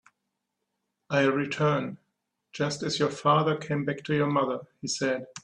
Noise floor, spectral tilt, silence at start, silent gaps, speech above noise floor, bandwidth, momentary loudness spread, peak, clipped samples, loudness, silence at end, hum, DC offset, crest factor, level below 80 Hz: -82 dBFS; -5 dB/octave; 1.1 s; none; 55 dB; 10.5 kHz; 9 LU; -10 dBFS; under 0.1%; -27 LUFS; 0.05 s; none; under 0.1%; 18 dB; -68 dBFS